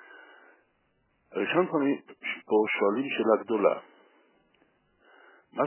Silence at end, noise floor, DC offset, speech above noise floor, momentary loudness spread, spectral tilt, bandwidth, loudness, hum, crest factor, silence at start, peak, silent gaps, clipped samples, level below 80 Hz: 0 s; -71 dBFS; under 0.1%; 45 dB; 11 LU; -9 dB/octave; 3.2 kHz; -27 LUFS; none; 20 dB; 0.15 s; -10 dBFS; none; under 0.1%; -82 dBFS